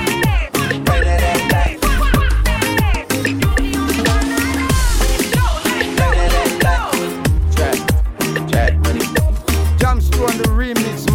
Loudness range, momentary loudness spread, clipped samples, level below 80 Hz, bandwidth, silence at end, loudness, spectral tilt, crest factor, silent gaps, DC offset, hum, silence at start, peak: 1 LU; 3 LU; under 0.1%; -18 dBFS; 17 kHz; 0 s; -16 LUFS; -5 dB/octave; 14 dB; none; under 0.1%; none; 0 s; 0 dBFS